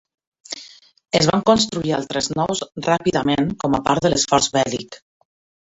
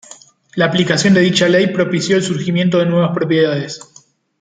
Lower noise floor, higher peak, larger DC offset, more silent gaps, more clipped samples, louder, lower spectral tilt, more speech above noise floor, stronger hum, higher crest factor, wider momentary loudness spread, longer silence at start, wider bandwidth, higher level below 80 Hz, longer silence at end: about the same, -44 dBFS vs -42 dBFS; about the same, -2 dBFS vs 0 dBFS; neither; neither; neither; second, -19 LUFS vs -14 LUFS; about the same, -4 dB/octave vs -5 dB/octave; about the same, 25 dB vs 28 dB; neither; first, 20 dB vs 14 dB; first, 15 LU vs 9 LU; first, 0.5 s vs 0.1 s; second, 8.4 kHz vs 9.4 kHz; first, -48 dBFS vs -56 dBFS; about the same, 0.7 s vs 0.6 s